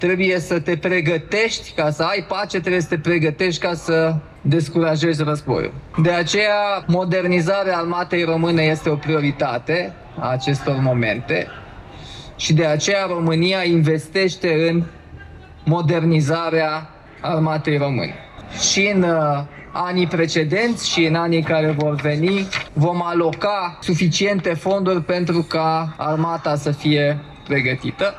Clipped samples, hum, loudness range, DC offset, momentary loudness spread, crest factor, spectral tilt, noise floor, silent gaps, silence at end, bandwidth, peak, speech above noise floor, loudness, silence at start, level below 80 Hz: under 0.1%; none; 2 LU; under 0.1%; 6 LU; 12 dB; -5.5 dB/octave; -39 dBFS; none; 0 s; 11 kHz; -6 dBFS; 20 dB; -19 LUFS; 0 s; -48 dBFS